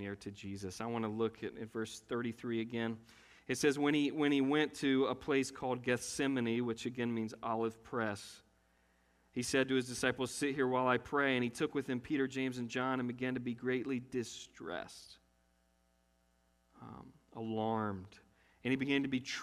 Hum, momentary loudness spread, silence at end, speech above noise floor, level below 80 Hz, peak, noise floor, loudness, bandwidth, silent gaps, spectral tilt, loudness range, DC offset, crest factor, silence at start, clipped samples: none; 13 LU; 0 s; 38 dB; -70 dBFS; -16 dBFS; -74 dBFS; -37 LUFS; 14.5 kHz; none; -4.5 dB/octave; 10 LU; under 0.1%; 22 dB; 0 s; under 0.1%